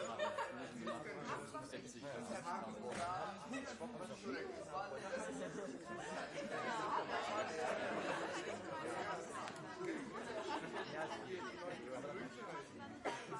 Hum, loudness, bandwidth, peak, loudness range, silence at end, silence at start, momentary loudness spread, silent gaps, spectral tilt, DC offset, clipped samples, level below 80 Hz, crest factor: none; -46 LUFS; 11.5 kHz; -28 dBFS; 4 LU; 0 s; 0 s; 7 LU; none; -4 dB/octave; under 0.1%; under 0.1%; -78 dBFS; 18 dB